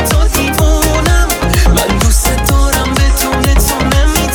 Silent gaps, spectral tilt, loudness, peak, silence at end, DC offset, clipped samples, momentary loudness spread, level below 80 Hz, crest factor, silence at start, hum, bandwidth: none; -4 dB/octave; -11 LUFS; 0 dBFS; 0 s; under 0.1%; 0.2%; 1 LU; -12 dBFS; 10 dB; 0 s; none; 19.5 kHz